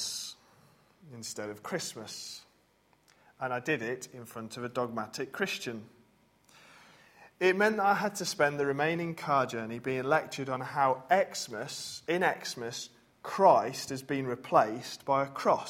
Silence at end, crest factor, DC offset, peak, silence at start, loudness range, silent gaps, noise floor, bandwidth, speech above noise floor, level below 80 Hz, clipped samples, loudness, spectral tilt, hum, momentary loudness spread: 0 s; 22 dB; under 0.1%; -10 dBFS; 0 s; 9 LU; none; -68 dBFS; 16.5 kHz; 37 dB; -74 dBFS; under 0.1%; -31 LUFS; -4 dB/octave; none; 15 LU